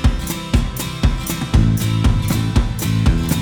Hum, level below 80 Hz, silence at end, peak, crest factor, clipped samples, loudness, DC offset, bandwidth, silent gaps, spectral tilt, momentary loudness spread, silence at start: none; -20 dBFS; 0 s; -2 dBFS; 16 dB; under 0.1%; -18 LUFS; under 0.1%; over 20 kHz; none; -5.5 dB/octave; 4 LU; 0 s